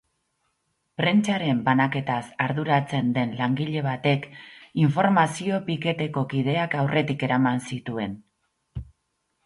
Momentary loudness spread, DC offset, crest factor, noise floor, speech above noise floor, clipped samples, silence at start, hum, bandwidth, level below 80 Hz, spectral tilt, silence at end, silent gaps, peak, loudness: 13 LU; under 0.1%; 18 dB; -75 dBFS; 52 dB; under 0.1%; 1 s; none; 11.5 kHz; -56 dBFS; -6.5 dB/octave; 0.6 s; none; -6 dBFS; -24 LUFS